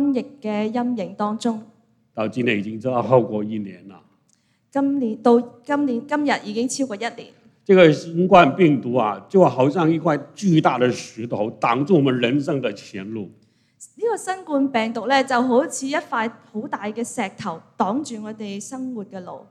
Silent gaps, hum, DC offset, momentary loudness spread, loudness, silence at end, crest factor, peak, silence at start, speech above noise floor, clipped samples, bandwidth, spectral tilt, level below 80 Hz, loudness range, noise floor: none; none; under 0.1%; 16 LU; -20 LUFS; 0.1 s; 20 dB; 0 dBFS; 0 s; 43 dB; under 0.1%; 12.5 kHz; -6 dB/octave; -68 dBFS; 7 LU; -64 dBFS